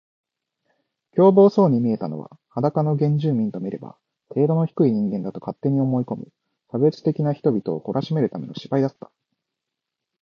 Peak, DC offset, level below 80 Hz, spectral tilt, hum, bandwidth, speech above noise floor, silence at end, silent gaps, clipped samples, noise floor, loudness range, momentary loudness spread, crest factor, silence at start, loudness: -4 dBFS; under 0.1%; -66 dBFS; -10.5 dB/octave; none; 6.6 kHz; 63 dB; 1.3 s; none; under 0.1%; -84 dBFS; 4 LU; 15 LU; 18 dB; 1.15 s; -21 LUFS